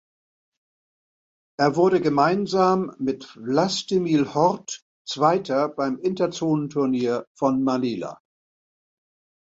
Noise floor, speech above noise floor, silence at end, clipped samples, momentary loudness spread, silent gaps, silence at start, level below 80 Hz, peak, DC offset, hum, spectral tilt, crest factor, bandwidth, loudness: under -90 dBFS; over 68 dB; 1.3 s; under 0.1%; 12 LU; 4.82-5.05 s, 7.27-7.35 s; 1.6 s; -64 dBFS; -4 dBFS; under 0.1%; none; -5.5 dB/octave; 20 dB; 8 kHz; -22 LUFS